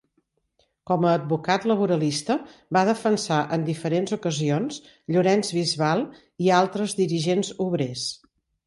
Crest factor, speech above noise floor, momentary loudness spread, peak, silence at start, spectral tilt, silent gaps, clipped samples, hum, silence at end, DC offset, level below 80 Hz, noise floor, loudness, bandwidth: 18 dB; 48 dB; 7 LU; -6 dBFS; 0.9 s; -5.5 dB/octave; none; under 0.1%; none; 0.5 s; under 0.1%; -66 dBFS; -71 dBFS; -24 LUFS; 11.5 kHz